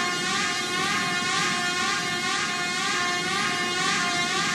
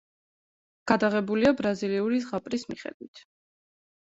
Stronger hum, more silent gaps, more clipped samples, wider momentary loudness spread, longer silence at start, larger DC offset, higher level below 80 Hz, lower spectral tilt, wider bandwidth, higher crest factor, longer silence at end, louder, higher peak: neither; second, none vs 2.94-3.00 s, 3.08-3.13 s; neither; second, 2 LU vs 17 LU; second, 0 s vs 0.85 s; neither; about the same, -64 dBFS vs -62 dBFS; second, -1.5 dB/octave vs -6 dB/octave; first, 16 kHz vs 8 kHz; second, 14 dB vs 24 dB; second, 0 s vs 1 s; about the same, -24 LUFS vs -26 LUFS; second, -10 dBFS vs -4 dBFS